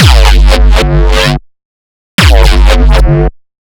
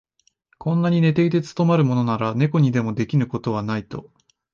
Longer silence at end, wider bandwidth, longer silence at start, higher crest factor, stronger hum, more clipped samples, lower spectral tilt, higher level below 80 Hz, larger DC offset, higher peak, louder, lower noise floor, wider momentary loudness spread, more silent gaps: about the same, 0.5 s vs 0.5 s; first, 16 kHz vs 7.2 kHz; second, 0 s vs 0.6 s; second, 6 dB vs 14 dB; neither; first, 7% vs under 0.1%; second, -5 dB/octave vs -8.5 dB/octave; first, -6 dBFS vs -56 dBFS; neither; first, 0 dBFS vs -6 dBFS; first, -8 LUFS vs -21 LUFS; first, under -90 dBFS vs -63 dBFS; second, 6 LU vs 10 LU; first, 1.65-2.18 s vs none